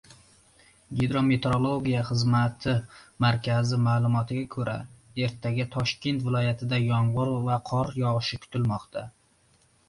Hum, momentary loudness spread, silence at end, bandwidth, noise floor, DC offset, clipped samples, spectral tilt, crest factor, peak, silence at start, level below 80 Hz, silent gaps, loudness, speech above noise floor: none; 8 LU; 0.8 s; 11 kHz; -63 dBFS; under 0.1%; under 0.1%; -7 dB/octave; 16 dB; -12 dBFS; 0.9 s; -54 dBFS; none; -27 LUFS; 38 dB